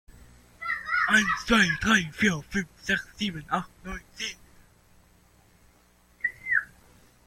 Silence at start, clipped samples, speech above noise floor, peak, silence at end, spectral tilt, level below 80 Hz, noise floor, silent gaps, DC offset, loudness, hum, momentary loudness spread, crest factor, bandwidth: 0.6 s; under 0.1%; 34 dB; -8 dBFS; 0.6 s; -3.5 dB/octave; -50 dBFS; -61 dBFS; none; under 0.1%; -26 LUFS; 60 Hz at -55 dBFS; 14 LU; 20 dB; 16 kHz